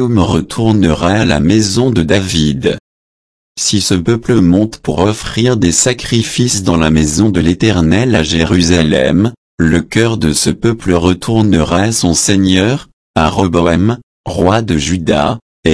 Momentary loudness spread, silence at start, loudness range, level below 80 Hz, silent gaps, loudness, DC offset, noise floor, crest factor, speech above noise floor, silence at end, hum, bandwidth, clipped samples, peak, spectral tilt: 5 LU; 0 s; 2 LU; -30 dBFS; 2.80-3.55 s, 9.38-9.58 s, 12.93-13.14 s, 14.03-14.24 s, 15.42-15.63 s; -12 LUFS; 0.1%; under -90 dBFS; 12 dB; over 79 dB; 0 s; none; 11 kHz; under 0.1%; 0 dBFS; -5 dB/octave